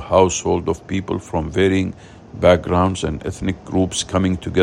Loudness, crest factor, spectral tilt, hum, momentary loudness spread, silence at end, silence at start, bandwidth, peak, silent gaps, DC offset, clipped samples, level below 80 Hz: -19 LUFS; 18 dB; -5.5 dB/octave; none; 9 LU; 0 s; 0 s; 11 kHz; 0 dBFS; none; under 0.1%; under 0.1%; -42 dBFS